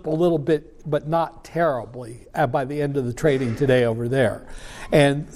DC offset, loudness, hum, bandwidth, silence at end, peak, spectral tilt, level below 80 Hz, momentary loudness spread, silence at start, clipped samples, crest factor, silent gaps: under 0.1%; -22 LUFS; none; 14.5 kHz; 0 s; -4 dBFS; -7 dB/octave; -44 dBFS; 13 LU; 0.05 s; under 0.1%; 18 dB; none